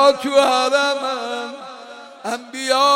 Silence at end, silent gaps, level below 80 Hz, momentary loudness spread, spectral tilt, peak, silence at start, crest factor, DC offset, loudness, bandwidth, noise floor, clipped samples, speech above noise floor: 0 s; none; -68 dBFS; 20 LU; -1 dB/octave; -4 dBFS; 0 s; 14 dB; under 0.1%; -19 LUFS; 16 kHz; -38 dBFS; under 0.1%; 20 dB